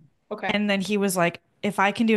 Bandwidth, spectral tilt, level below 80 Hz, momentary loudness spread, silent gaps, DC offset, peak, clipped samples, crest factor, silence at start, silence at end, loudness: 12.5 kHz; -4.5 dB/octave; -66 dBFS; 9 LU; none; under 0.1%; -6 dBFS; under 0.1%; 18 dB; 0.3 s; 0 s; -24 LUFS